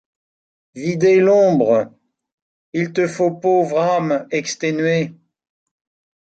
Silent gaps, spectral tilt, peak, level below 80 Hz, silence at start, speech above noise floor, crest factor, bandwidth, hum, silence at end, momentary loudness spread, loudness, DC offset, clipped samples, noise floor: 2.32-2.73 s; -6 dB/octave; -4 dBFS; -66 dBFS; 0.75 s; over 74 dB; 14 dB; 9 kHz; none; 1.15 s; 11 LU; -17 LUFS; under 0.1%; under 0.1%; under -90 dBFS